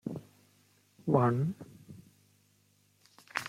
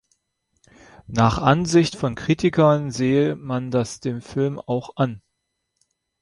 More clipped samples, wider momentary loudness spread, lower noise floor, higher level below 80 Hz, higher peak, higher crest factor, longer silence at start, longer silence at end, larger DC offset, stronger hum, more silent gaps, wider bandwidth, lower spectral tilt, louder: neither; first, 26 LU vs 10 LU; second, -69 dBFS vs -77 dBFS; second, -72 dBFS vs -48 dBFS; second, -12 dBFS vs -2 dBFS; about the same, 24 dB vs 20 dB; second, 0.05 s vs 1.1 s; second, 0 s vs 1.05 s; neither; first, 50 Hz at -55 dBFS vs none; neither; first, 15.5 kHz vs 11.5 kHz; about the same, -7.5 dB/octave vs -6.5 dB/octave; second, -31 LUFS vs -21 LUFS